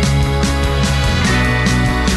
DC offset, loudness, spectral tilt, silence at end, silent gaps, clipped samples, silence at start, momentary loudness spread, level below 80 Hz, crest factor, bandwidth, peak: under 0.1%; -15 LUFS; -5 dB/octave; 0 s; none; under 0.1%; 0 s; 2 LU; -20 dBFS; 10 dB; 12.5 kHz; -4 dBFS